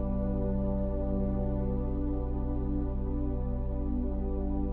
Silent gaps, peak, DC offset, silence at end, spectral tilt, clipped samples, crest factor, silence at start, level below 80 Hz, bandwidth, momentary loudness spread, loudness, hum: none; -18 dBFS; under 0.1%; 0 s; -13.5 dB/octave; under 0.1%; 12 dB; 0 s; -32 dBFS; 2.6 kHz; 2 LU; -33 LUFS; none